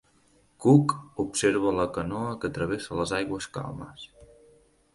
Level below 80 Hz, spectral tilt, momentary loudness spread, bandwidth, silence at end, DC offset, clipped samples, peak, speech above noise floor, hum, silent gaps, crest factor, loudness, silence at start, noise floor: -54 dBFS; -6 dB/octave; 18 LU; 11.5 kHz; 0.7 s; under 0.1%; under 0.1%; -6 dBFS; 37 dB; none; none; 22 dB; -27 LUFS; 0.6 s; -63 dBFS